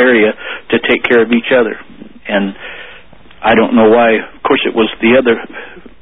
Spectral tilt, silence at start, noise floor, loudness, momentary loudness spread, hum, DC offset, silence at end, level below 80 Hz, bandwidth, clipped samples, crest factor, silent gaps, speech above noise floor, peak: -8 dB/octave; 0 s; -39 dBFS; -11 LUFS; 19 LU; none; 1%; 0.2 s; -46 dBFS; 4 kHz; under 0.1%; 12 dB; none; 28 dB; 0 dBFS